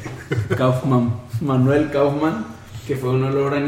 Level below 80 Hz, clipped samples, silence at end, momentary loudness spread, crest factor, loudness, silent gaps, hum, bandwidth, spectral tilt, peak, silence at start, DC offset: -48 dBFS; under 0.1%; 0 s; 10 LU; 14 dB; -20 LUFS; none; none; 15 kHz; -8 dB/octave; -6 dBFS; 0 s; under 0.1%